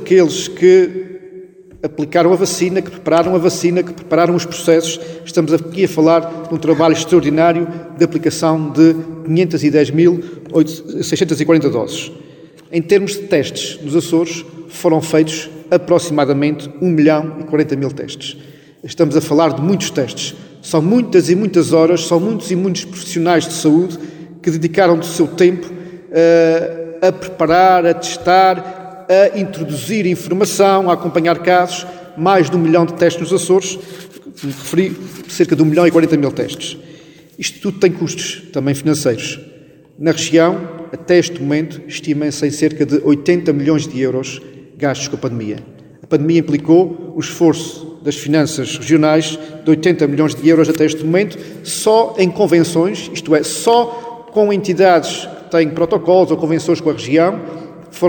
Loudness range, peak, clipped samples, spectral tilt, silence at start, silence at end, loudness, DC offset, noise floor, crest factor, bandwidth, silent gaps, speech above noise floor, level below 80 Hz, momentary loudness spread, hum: 3 LU; 0 dBFS; under 0.1%; -5.5 dB/octave; 0 s; 0 s; -14 LUFS; under 0.1%; -42 dBFS; 14 dB; 19 kHz; none; 28 dB; -56 dBFS; 13 LU; none